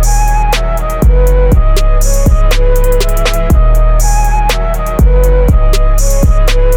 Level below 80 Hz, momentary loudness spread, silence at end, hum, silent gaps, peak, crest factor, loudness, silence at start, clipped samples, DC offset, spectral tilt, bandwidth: -8 dBFS; 3 LU; 0 s; none; none; 0 dBFS; 6 dB; -11 LUFS; 0 s; under 0.1%; under 0.1%; -5 dB/octave; 17 kHz